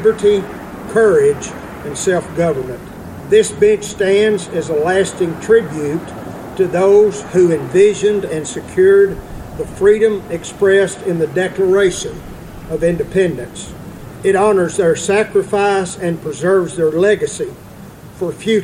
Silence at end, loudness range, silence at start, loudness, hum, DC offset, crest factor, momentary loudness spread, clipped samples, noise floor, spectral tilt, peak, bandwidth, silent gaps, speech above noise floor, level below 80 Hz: 0 s; 3 LU; 0 s; -15 LUFS; none; under 0.1%; 14 dB; 17 LU; under 0.1%; -35 dBFS; -5 dB/octave; 0 dBFS; 15 kHz; none; 21 dB; -42 dBFS